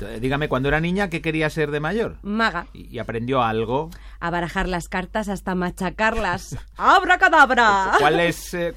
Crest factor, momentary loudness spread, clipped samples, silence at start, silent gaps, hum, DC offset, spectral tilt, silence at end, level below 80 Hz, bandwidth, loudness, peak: 18 dB; 13 LU; under 0.1%; 0 s; none; none; under 0.1%; -5 dB/octave; 0 s; -38 dBFS; 16.5 kHz; -20 LUFS; -2 dBFS